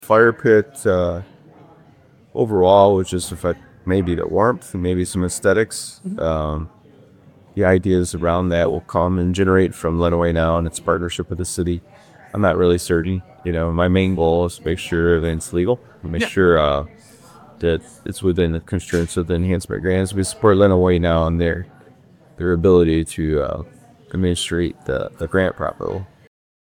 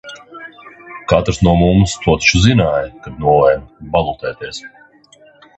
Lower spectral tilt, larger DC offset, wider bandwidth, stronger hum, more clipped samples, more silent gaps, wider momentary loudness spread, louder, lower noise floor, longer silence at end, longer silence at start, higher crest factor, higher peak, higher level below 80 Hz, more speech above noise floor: about the same, -6 dB/octave vs -5.5 dB/octave; neither; first, 16.5 kHz vs 8.6 kHz; neither; neither; neither; second, 11 LU vs 22 LU; second, -19 LUFS vs -14 LUFS; about the same, -50 dBFS vs -47 dBFS; second, 0.75 s vs 0.9 s; about the same, 0 s vs 0.05 s; about the same, 18 dB vs 16 dB; about the same, 0 dBFS vs 0 dBFS; second, -36 dBFS vs -30 dBFS; about the same, 32 dB vs 33 dB